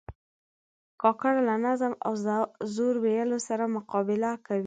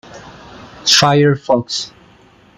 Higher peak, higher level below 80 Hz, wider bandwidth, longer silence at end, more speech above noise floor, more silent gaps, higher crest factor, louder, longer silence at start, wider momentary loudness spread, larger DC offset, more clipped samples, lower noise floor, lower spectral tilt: second, -10 dBFS vs 0 dBFS; second, -62 dBFS vs -52 dBFS; second, 9.4 kHz vs 16 kHz; second, 0 s vs 0.7 s; first, over 63 dB vs 34 dB; first, 0.15-0.98 s vs none; about the same, 18 dB vs 16 dB; second, -28 LUFS vs -13 LUFS; about the same, 0.1 s vs 0.15 s; second, 4 LU vs 13 LU; neither; neither; first, under -90 dBFS vs -47 dBFS; first, -6 dB/octave vs -3.5 dB/octave